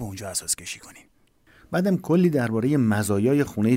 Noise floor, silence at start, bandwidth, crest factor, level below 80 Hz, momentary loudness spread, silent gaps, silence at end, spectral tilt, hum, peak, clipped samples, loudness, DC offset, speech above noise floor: -56 dBFS; 0 s; 16 kHz; 14 dB; -58 dBFS; 9 LU; none; 0 s; -5.5 dB/octave; none; -10 dBFS; under 0.1%; -23 LUFS; under 0.1%; 34 dB